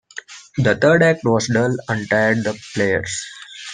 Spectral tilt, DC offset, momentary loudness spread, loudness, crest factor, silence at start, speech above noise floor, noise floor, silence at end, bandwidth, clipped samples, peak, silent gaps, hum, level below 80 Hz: -5 dB/octave; under 0.1%; 18 LU; -18 LUFS; 18 dB; 0.15 s; 20 dB; -38 dBFS; 0 s; 10 kHz; under 0.1%; -2 dBFS; none; none; -54 dBFS